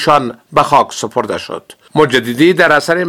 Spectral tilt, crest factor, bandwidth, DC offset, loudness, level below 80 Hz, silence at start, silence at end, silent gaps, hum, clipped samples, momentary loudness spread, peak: -4.5 dB/octave; 12 dB; 17.5 kHz; under 0.1%; -12 LUFS; -48 dBFS; 0 s; 0 s; none; none; 0.3%; 11 LU; 0 dBFS